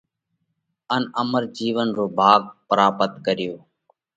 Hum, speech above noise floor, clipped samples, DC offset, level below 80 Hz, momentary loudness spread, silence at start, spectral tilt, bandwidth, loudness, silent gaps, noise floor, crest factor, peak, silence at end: none; 55 dB; under 0.1%; under 0.1%; -66 dBFS; 10 LU; 0.9 s; -5.5 dB/octave; 9 kHz; -21 LUFS; none; -75 dBFS; 22 dB; 0 dBFS; 0.6 s